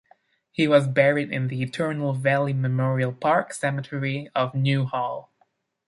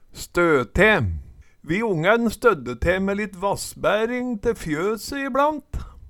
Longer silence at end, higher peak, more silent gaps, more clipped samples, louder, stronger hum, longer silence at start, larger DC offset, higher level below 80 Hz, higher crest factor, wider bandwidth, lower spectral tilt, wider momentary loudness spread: first, 0.7 s vs 0 s; about the same, -4 dBFS vs -4 dBFS; neither; neither; about the same, -24 LUFS vs -22 LUFS; neither; first, 0.6 s vs 0.15 s; neither; second, -66 dBFS vs -38 dBFS; about the same, 20 dB vs 18 dB; second, 11.5 kHz vs 18.5 kHz; about the same, -6.5 dB/octave vs -5.5 dB/octave; about the same, 8 LU vs 10 LU